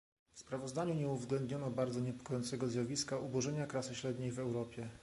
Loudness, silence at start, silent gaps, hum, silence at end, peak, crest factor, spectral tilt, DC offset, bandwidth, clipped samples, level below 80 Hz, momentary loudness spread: -40 LUFS; 0.35 s; none; none; 0 s; -22 dBFS; 16 dB; -5.5 dB/octave; under 0.1%; 11.5 kHz; under 0.1%; -68 dBFS; 5 LU